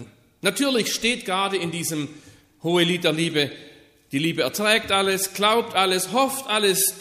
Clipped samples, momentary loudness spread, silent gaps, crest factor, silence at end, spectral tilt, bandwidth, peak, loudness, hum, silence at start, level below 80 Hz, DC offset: under 0.1%; 7 LU; none; 18 dB; 0 s; -3 dB/octave; 15.5 kHz; -4 dBFS; -22 LUFS; none; 0 s; -60 dBFS; under 0.1%